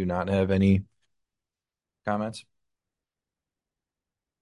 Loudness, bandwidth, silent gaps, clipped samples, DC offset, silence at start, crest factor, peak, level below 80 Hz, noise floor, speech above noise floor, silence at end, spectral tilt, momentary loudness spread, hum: -26 LUFS; 11.5 kHz; none; under 0.1%; under 0.1%; 0 s; 20 dB; -10 dBFS; -46 dBFS; under -90 dBFS; over 65 dB; 2 s; -8 dB/octave; 14 LU; none